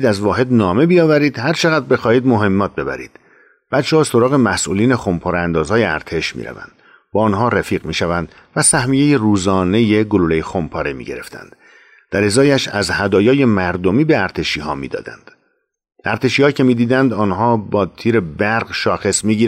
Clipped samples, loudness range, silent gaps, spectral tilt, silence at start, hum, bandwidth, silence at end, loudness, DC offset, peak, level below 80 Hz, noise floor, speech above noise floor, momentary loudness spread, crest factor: under 0.1%; 3 LU; none; -5 dB/octave; 0 s; none; 15.5 kHz; 0 s; -15 LUFS; under 0.1%; -4 dBFS; -44 dBFS; -66 dBFS; 51 dB; 10 LU; 12 dB